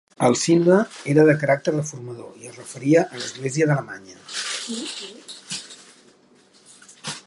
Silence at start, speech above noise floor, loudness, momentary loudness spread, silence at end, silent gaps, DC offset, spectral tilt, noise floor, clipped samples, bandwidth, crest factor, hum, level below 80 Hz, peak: 0.2 s; 34 dB; -21 LUFS; 21 LU; 0.1 s; none; under 0.1%; -5 dB/octave; -55 dBFS; under 0.1%; 11.5 kHz; 20 dB; none; -70 dBFS; -2 dBFS